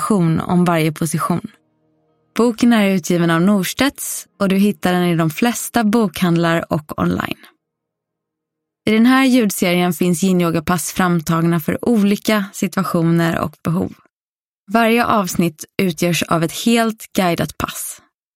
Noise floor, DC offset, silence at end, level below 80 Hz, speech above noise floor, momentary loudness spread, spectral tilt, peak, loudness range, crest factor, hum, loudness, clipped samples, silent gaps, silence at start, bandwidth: under -90 dBFS; under 0.1%; 0.4 s; -48 dBFS; over 74 dB; 8 LU; -5.5 dB/octave; 0 dBFS; 3 LU; 16 dB; none; -17 LUFS; under 0.1%; 14.13-14.66 s; 0 s; 16.5 kHz